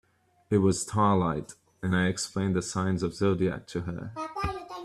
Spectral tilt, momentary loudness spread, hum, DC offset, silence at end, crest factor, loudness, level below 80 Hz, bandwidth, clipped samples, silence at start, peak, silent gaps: -5.5 dB/octave; 11 LU; none; under 0.1%; 0 s; 18 dB; -28 LUFS; -52 dBFS; 12.5 kHz; under 0.1%; 0.5 s; -10 dBFS; none